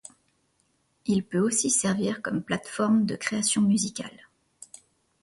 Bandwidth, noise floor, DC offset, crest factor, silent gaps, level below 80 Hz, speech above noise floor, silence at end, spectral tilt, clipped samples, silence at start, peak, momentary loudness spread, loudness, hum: 11.5 kHz; -70 dBFS; under 0.1%; 18 dB; none; -66 dBFS; 45 dB; 1.1 s; -4 dB/octave; under 0.1%; 1.05 s; -10 dBFS; 17 LU; -25 LUFS; none